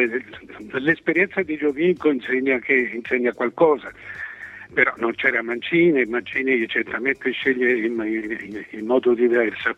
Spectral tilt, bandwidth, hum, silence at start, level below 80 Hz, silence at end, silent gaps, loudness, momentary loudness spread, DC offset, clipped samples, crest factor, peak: -7 dB/octave; 6 kHz; none; 0 s; -62 dBFS; 0.05 s; none; -21 LUFS; 13 LU; under 0.1%; under 0.1%; 20 dB; -2 dBFS